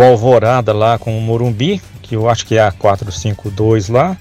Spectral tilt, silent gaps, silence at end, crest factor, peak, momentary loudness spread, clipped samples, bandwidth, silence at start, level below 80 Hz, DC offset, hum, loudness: -6.5 dB/octave; none; 0 s; 12 dB; 0 dBFS; 10 LU; under 0.1%; 13.5 kHz; 0 s; -40 dBFS; under 0.1%; none; -13 LUFS